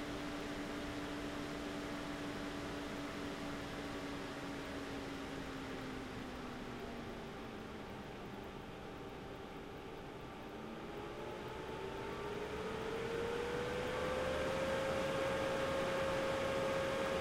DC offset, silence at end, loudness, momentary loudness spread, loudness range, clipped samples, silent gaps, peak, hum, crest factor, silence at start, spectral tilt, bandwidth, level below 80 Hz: under 0.1%; 0 s; -42 LUFS; 12 LU; 11 LU; under 0.1%; none; -26 dBFS; none; 16 dB; 0 s; -5 dB/octave; 16 kHz; -58 dBFS